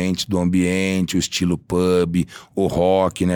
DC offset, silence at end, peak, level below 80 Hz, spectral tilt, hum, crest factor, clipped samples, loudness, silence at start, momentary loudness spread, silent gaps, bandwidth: under 0.1%; 0 s; -4 dBFS; -44 dBFS; -5.5 dB/octave; none; 14 dB; under 0.1%; -19 LUFS; 0 s; 5 LU; none; 19.5 kHz